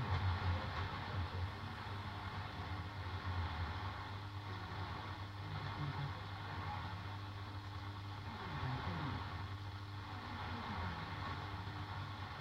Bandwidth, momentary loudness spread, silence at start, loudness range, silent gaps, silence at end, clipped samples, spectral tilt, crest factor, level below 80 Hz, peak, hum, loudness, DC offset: 9 kHz; 5 LU; 0 s; 2 LU; none; 0 s; under 0.1%; -6.5 dB/octave; 18 dB; -58 dBFS; -26 dBFS; none; -45 LUFS; under 0.1%